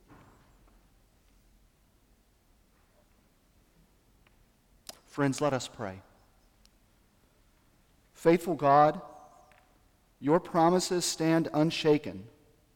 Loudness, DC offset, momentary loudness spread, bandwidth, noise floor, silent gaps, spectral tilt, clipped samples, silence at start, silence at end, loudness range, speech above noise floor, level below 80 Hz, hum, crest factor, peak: -27 LUFS; under 0.1%; 24 LU; 17.5 kHz; -66 dBFS; none; -5 dB/octave; under 0.1%; 5.15 s; 0.5 s; 9 LU; 39 dB; -64 dBFS; none; 22 dB; -10 dBFS